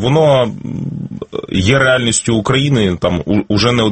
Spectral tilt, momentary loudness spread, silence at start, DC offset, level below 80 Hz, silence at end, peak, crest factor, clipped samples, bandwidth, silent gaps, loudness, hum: -5 dB/octave; 13 LU; 0 s; under 0.1%; -38 dBFS; 0 s; 0 dBFS; 14 dB; under 0.1%; 8.8 kHz; none; -14 LUFS; none